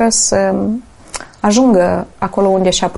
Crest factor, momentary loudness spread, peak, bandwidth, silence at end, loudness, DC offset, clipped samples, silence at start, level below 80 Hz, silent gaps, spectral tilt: 12 dB; 16 LU; -2 dBFS; 11.5 kHz; 0 s; -13 LUFS; under 0.1%; under 0.1%; 0 s; -40 dBFS; none; -4 dB/octave